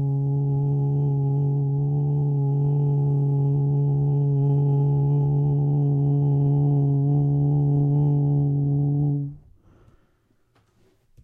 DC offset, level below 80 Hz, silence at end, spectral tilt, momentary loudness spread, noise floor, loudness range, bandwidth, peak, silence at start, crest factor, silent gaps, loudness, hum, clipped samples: under 0.1%; -50 dBFS; 1.85 s; -14 dB/octave; 3 LU; -65 dBFS; 3 LU; 1.1 kHz; -12 dBFS; 0 s; 10 dB; none; -22 LUFS; none; under 0.1%